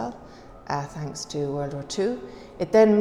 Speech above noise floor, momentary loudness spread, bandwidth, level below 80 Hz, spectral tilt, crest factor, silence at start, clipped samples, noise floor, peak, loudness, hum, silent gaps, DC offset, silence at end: 21 dB; 23 LU; 11.5 kHz; -54 dBFS; -6 dB/octave; 18 dB; 0 s; under 0.1%; -45 dBFS; -6 dBFS; -26 LUFS; none; none; under 0.1%; 0 s